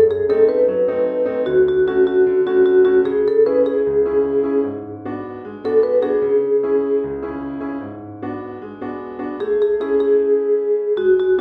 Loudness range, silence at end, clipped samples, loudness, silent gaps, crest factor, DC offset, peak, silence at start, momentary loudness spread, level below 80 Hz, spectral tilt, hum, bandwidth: 7 LU; 0 s; under 0.1%; -17 LUFS; none; 14 dB; under 0.1%; -4 dBFS; 0 s; 14 LU; -52 dBFS; -9 dB/octave; none; 4.6 kHz